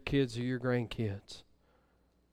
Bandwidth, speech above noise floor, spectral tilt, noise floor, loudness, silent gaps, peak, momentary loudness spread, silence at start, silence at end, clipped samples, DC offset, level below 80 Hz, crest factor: 12 kHz; 37 dB; -7 dB/octave; -71 dBFS; -35 LUFS; none; -18 dBFS; 17 LU; 0 s; 0.9 s; under 0.1%; under 0.1%; -56 dBFS; 18 dB